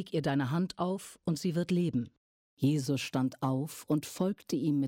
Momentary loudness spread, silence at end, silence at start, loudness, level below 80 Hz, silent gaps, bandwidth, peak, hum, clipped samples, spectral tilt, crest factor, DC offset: 5 LU; 0 s; 0 s; -32 LUFS; -68 dBFS; 2.17-2.57 s; 17 kHz; -18 dBFS; none; under 0.1%; -6.5 dB/octave; 14 dB; under 0.1%